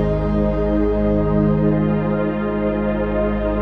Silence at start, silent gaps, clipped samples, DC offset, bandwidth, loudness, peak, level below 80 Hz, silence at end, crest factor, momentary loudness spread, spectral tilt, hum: 0 s; none; under 0.1%; under 0.1%; 5.2 kHz; -19 LUFS; -6 dBFS; -26 dBFS; 0 s; 12 dB; 3 LU; -11 dB/octave; 50 Hz at -50 dBFS